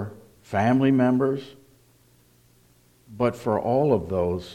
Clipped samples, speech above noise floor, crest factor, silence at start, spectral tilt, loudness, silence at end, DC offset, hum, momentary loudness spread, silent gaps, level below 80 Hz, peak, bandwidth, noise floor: under 0.1%; 36 dB; 16 dB; 0 s; -8 dB/octave; -23 LUFS; 0 s; under 0.1%; none; 8 LU; none; -56 dBFS; -8 dBFS; 13 kHz; -59 dBFS